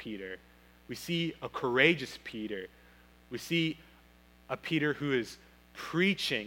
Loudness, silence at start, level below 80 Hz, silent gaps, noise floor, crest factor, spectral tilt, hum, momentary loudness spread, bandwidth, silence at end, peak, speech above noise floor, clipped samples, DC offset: -32 LUFS; 0 s; -64 dBFS; none; -60 dBFS; 26 dB; -5 dB/octave; 60 Hz at -60 dBFS; 19 LU; 17 kHz; 0 s; -8 dBFS; 28 dB; under 0.1%; under 0.1%